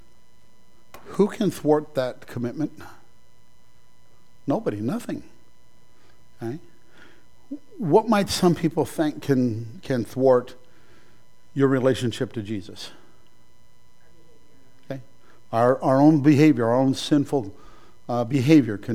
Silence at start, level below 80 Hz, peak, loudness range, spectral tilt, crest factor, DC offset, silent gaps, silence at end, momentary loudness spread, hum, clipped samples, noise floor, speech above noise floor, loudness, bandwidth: 1.05 s; -58 dBFS; -4 dBFS; 12 LU; -6.5 dB/octave; 20 dB; 0.9%; none; 0 s; 20 LU; none; under 0.1%; -61 dBFS; 39 dB; -22 LUFS; 15.5 kHz